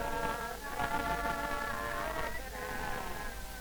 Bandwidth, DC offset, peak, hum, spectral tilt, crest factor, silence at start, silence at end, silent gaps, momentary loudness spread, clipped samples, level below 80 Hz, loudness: over 20 kHz; under 0.1%; -18 dBFS; none; -3.5 dB/octave; 20 dB; 0 s; 0 s; none; 6 LU; under 0.1%; -46 dBFS; -37 LUFS